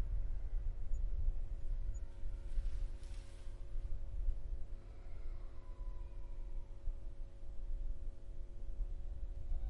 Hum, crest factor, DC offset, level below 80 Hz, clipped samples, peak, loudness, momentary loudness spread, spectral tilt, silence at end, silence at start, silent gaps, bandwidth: none; 14 dB; under 0.1%; -40 dBFS; under 0.1%; -24 dBFS; -49 LUFS; 9 LU; -7 dB/octave; 0 s; 0 s; none; 6.8 kHz